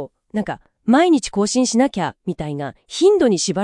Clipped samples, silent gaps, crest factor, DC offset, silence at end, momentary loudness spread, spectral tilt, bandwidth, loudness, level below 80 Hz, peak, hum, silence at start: under 0.1%; none; 16 dB; under 0.1%; 0 s; 13 LU; -4.5 dB/octave; 11.5 kHz; -18 LUFS; -50 dBFS; -2 dBFS; none; 0 s